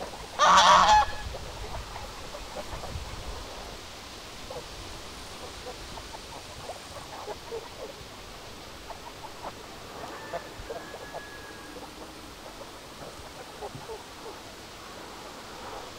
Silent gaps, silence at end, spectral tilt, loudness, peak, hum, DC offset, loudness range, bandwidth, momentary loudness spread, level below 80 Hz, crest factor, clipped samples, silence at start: none; 0 s; -2 dB/octave; -29 LUFS; -6 dBFS; none; under 0.1%; 15 LU; 16 kHz; 19 LU; -48 dBFS; 24 dB; under 0.1%; 0 s